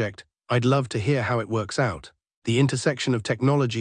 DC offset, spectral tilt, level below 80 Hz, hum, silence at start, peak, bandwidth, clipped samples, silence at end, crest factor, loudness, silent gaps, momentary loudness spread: under 0.1%; -6 dB/octave; -58 dBFS; none; 0 s; -8 dBFS; 10 kHz; under 0.1%; 0 s; 16 dB; -24 LUFS; 2.36-2.42 s; 6 LU